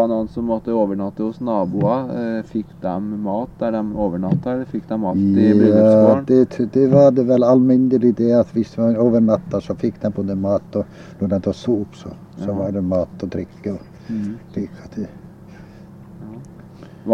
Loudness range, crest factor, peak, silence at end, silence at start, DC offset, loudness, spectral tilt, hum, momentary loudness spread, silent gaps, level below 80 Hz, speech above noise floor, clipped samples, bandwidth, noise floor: 13 LU; 18 dB; 0 dBFS; 0 s; 0 s; under 0.1%; -18 LUFS; -9.5 dB/octave; none; 17 LU; none; -50 dBFS; 23 dB; under 0.1%; 7 kHz; -40 dBFS